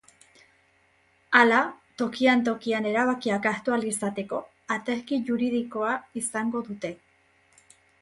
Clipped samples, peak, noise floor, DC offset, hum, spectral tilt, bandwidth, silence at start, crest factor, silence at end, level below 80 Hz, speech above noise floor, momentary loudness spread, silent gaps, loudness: under 0.1%; -4 dBFS; -64 dBFS; under 0.1%; none; -4 dB/octave; 11.5 kHz; 1.3 s; 24 dB; 1.05 s; -68 dBFS; 39 dB; 12 LU; none; -26 LUFS